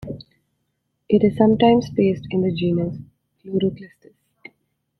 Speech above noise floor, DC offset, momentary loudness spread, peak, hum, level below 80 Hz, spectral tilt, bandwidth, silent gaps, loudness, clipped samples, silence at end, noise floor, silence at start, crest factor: 55 dB; under 0.1%; 20 LU; -2 dBFS; none; -52 dBFS; -8.5 dB/octave; 6.2 kHz; none; -19 LUFS; under 0.1%; 1.15 s; -73 dBFS; 0 s; 18 dB